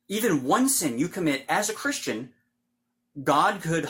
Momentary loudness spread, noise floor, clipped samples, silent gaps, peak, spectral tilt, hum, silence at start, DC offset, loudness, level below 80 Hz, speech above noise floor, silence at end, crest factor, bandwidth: 10 LU; -78 dBFS; under 0.1%; none; -8 dBFS; -3.5 dB/octave; none; 0.1 s; under 0.1%; -25 LUFS; -64 dBFS; 52 dB; 0 s; 18 dB; 16.5 kHz